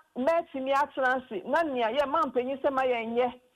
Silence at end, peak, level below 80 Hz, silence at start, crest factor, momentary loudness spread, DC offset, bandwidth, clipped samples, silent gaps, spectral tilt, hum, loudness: 0.2 s; -16 dBFS; -66 dBFS; 0.15 s; 12 dB; 3 LU; under 0.1%; 15 kHz; under 0.1%; none; -4.5 dB/octave; none; -28 LUFS